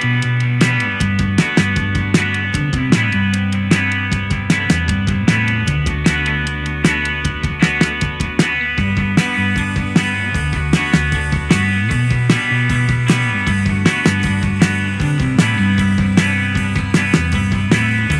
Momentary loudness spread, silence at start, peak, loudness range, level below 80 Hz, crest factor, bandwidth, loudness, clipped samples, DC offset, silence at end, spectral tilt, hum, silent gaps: 4 LU; 0 s; 0 dBFS; 1 LU; -28 dBFS; 16 dB; 12.5 kHz; -16 LUFS; under 0.1%; under 0.1%; 0 s; -5.5 dB/octave; none; none